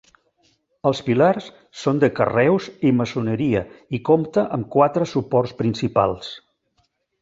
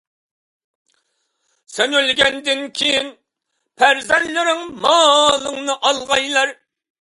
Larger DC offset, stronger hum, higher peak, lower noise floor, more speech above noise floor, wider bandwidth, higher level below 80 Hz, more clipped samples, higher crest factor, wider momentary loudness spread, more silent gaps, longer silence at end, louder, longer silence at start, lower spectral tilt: neither; neither; about the same, -2 dBFS vs 0 dBFS; second, -68 dBFS vs -74 dBFS; second, 48 dB vs 58 dB; second, 7.8 kHz vs 11.5 kHz; about the same, -54 dBFS vs -56 dBFS; neither; about the same, 18 dB vs 18 dB; about the same, 9 LU vs 9 LU; neither; first, 0.85 s vs 0.5 s; second, -20 LUFS vs -16 LUFS; second, 0.85 s vs 1.7 s; first, -7 dB/octave vs -0.5 dB/octave